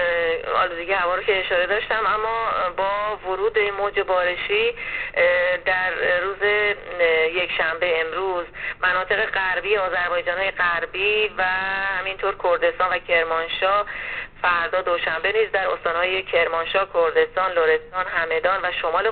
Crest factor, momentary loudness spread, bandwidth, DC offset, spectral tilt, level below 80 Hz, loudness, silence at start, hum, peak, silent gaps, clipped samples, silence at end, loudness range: 16 dB; 4 LU; 4.6 kHz; 0.1%; 0.5 dB/octave; -48 dBFS; -21 LUFS; 0 s; none; -6 dBFS; none; under 0.1%; 0 s; 1 LU